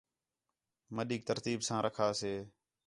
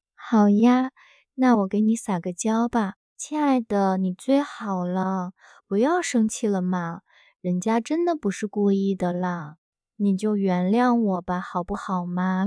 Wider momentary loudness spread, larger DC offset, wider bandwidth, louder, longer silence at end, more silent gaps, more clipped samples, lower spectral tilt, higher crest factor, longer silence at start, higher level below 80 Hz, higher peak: about the same, 11 LU vs 10 LU; neither; about the same, 11.5 kHz vs 11 kHz; second, -36 LUFS vs -24 LUFS; first, 0.4 s vs 0 s; second, none vs 2.96-3.16 s, 9.58-9.72 s; neither; second, -4.5 dB/octave vs -6.5 dB/octave; about the same, 20 dB vs 16 dB; first, 0.9 s vs 0.2 s; second, -72 dBFS vs -58 dBFS; second, -18 dBFS vs -8 dBFS